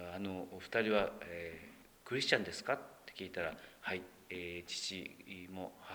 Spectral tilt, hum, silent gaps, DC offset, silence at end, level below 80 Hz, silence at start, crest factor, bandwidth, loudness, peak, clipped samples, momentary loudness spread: -3.5 dB/octave; none; none; under 0.1%; 0 s; -70 dBFS; 0 s; 28 dB; over 20 kHz; -40 LUFS; -12 dBFS; under 0.1%; 15 LU